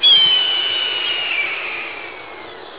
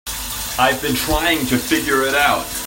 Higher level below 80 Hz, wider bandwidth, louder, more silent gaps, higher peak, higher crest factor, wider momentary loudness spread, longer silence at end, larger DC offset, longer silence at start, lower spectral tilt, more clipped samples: second, -62 dBFS vs -34 dBFS; second, 4 kHz vs 16.5 kHz; about the same, -15 LUFS vs -17 LUFS; neither; about the same, -2 dBFS vs 0 dBFS; about the same, 16 dB vs 18 dB; first, 22 LU vs 7 LU; about the same, 0 s vs 0 s; first, 0.4% vs under 0.1%; about the same, 0 s vs 0.05 s; first, -4.5 dB/octave vs -3 dB/octave; neither